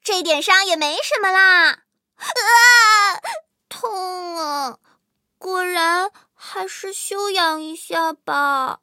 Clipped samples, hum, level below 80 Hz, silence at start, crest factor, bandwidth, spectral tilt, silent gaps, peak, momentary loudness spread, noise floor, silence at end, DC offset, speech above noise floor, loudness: under 0.1%; none; -84 dBFS; 0.05 s; 18 dB; 16.5 kHz; 1 dB/octave; none; 0 dBFS; 19 LU; -66 dBFS; 0.05 s; under 0.1%; 48 dB; -16 LUFS